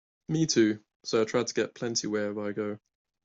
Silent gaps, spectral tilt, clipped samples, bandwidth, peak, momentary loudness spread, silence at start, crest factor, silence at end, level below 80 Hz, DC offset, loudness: 0.96-1.00 s; -4.5 dB/octave; under 0.1%; 8 kHz; -12 dBFS; 11 LU; 0.3 s; 18 dB; 0.5 s; -70 dBFS; under 0.1%; -29 LUFS